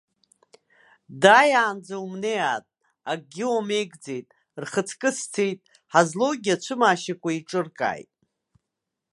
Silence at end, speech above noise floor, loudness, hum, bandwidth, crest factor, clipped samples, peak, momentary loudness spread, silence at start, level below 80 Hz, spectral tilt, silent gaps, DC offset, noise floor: 1.1 s; 61 dB; -23 LUFS; none; 11.5 kHz; 24 dB; under 0.1%; -2 dBFS; 18 LU; 1.1 s; -76 dBFS; -3.5 dB/octave; none; under 0.1%; -84 dBFS